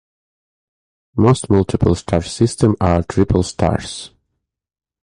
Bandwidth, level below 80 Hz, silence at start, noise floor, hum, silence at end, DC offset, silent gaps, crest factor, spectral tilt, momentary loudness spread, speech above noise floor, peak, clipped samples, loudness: 11 kHz; -32 dBFS; 1.15 s; -76 dBFS; none; 0.95 s; under 0.1%; none; 18 dB; -6.5 dB/octave; 11 LU; 60 dB; 0 dBFS; under 0.1%; -17 LUFS